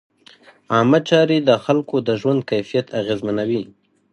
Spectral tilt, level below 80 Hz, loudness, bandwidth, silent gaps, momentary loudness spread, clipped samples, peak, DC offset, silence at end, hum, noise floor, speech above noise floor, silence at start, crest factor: -6.5 dB/octave; -60 dBFS; -18 LUFS; 10.5 kHz; none; 8 LU; under 0.1%; 0 dBFS; under 0.1%; 0.45 s; none; -49 dBFS; 31 dB; 0.7 s; 18 dB